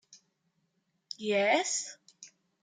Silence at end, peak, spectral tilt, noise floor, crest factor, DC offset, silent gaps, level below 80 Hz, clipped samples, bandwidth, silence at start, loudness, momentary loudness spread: 0.35 s; -14 dBFS; -2 dB/octave; -78 dBFS; 20 dB; under 0.1%; none; -88 dBFS; under 0.1%; 9.6 kHz; 0.1 s; -29 LUFS; 19 LU